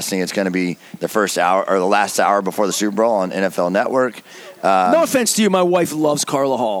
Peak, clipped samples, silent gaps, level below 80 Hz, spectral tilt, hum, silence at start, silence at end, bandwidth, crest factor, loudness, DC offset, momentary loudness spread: -2 dBFS; under 0.1%; none; -68 dBFS; -4 dB/octave; none; 0 s; 0 s; 18 kHz; 16 dB; -17 LUFS; under 0.1%; 7 LU